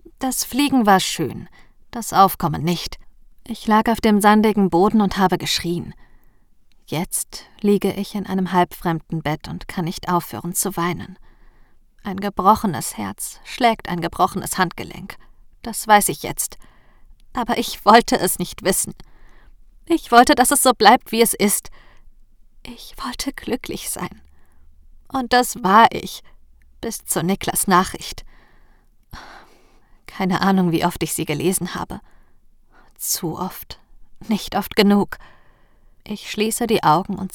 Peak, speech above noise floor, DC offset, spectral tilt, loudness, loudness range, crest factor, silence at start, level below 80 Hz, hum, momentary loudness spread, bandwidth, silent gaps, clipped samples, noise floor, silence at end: 0 dBFS; 32 dB; under 0.1%; -4 dB/octave; -19 LUFS; 8 LU; 20 dB; 0.2 s; -44 dBFS; none; 18 LU; over 20 kHz; none; under 0.1%; -51 dBFS; 0.05 s